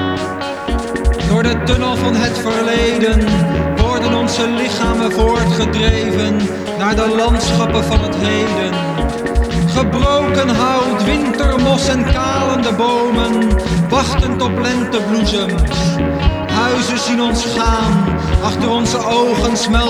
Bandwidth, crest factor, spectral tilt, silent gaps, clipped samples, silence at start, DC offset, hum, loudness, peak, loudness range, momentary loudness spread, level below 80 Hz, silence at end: 13.5 kHz; 14 dB; -5.5 dB/octave; none; under 0.1%; 0 s; under 0.1%; none; -15 LUFS; 0 dBFS; 1 LU; 4 LU; -22 dBFS; 0 s